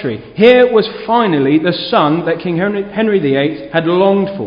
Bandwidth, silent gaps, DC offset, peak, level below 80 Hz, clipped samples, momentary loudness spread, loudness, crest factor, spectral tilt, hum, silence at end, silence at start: 5.4 kHz; none; under 0.1%; 0 dBFS; -50 dBFS; 0.1%; 8 LU; -13 LUFS; 12 dB; -9 dB/octave; none; 0 s; 0 s